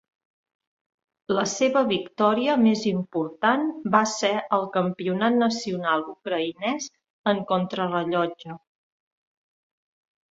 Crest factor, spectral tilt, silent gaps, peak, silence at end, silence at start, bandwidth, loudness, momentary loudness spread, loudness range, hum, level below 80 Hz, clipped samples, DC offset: 20 dB; -4.5 dB/octave; 7.10-7.24 s; -6 dBFS; 1.8 s; 1.3 s; 7.8 kHz; -24 LUFS; 9 LU; 6 LU; none; -68 dBFS; under 0.1%; under 0.1%